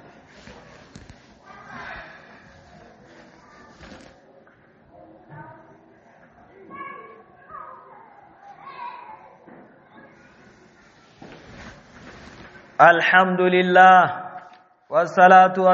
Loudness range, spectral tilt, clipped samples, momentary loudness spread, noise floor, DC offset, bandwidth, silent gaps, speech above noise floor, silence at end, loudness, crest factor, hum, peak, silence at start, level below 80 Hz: 26 LU; -3 dB/octave; under 0.1%; 30 LU; -54 dBFS; under 0.1%; 7.2 kHz; none; 40 dB; 0 s; -15 LUFS; 22 dB; none; 0 dBFS; 1.75 s; -62 dBFS